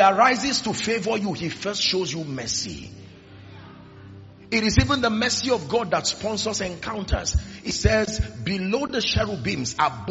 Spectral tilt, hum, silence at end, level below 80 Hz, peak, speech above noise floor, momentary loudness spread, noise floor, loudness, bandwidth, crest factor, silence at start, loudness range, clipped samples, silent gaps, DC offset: -3.5 dB/octave; none; 0 s; -36 dBFS; -2 dBFS; 21 dB; 9 LU; -44 dBFS; -23 LUFS; 8 kHz; 22 dB; 0 s; 4 LU; under 0.1%; none; under 0.1%